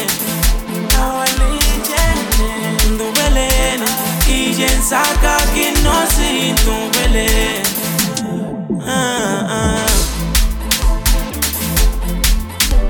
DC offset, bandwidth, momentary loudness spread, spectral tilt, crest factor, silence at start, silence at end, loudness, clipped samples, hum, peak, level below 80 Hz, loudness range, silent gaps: under 0.1%; 19.5 kHz; 4 LU; -3 dB/octave; 14 dB; 0 s; 0 s; -15 LUFS; under 0.1%; none; 0 dBFS; -18 dBFS; 3 LU; none